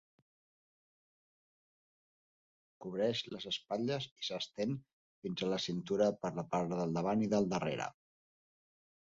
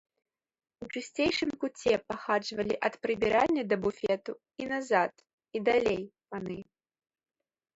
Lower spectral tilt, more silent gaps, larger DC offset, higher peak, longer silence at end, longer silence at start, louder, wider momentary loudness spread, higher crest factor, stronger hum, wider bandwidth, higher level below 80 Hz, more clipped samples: about the same, -4.5 dB/octave vs -5 dB/octave; first, 4.12-4.16 s, 4.93-5.22 s vs 5.33-5.38 s; neither; second, -20 dBFS vs -12 dBFS; about the same, 1.25 s vs 1.15 s; first, 2.8 s vs 0.8 s; second, -37 LUFS vs -31 LUFS; second, 10 LU vs 14 LU; about the same, 20 dB vs 20 dB; neither; about the same, 7.6 kHz vs 8 kHz; second, -72 dBFS vs -62 dBFS; neither